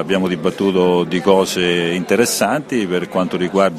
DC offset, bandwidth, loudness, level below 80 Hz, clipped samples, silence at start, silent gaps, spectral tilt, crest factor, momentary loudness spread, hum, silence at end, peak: under 0.1%; 14 kHz; -16 LUFS; -54 dBFS; under 0.1%; 0 s; none; -4.5 dB/octave; 16 dB; 5 LU; none; 0 s; 0 dBFS